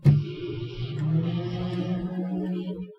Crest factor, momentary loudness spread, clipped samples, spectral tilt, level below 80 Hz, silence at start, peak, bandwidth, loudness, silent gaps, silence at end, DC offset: 20 dB; 8 LU; under 0.1%; -9.5 dB/octave; -50 dBFS; 0 s; -6 dBFS; 6 kHz; -29 LUFS; none; 0.05 s; under 0.1%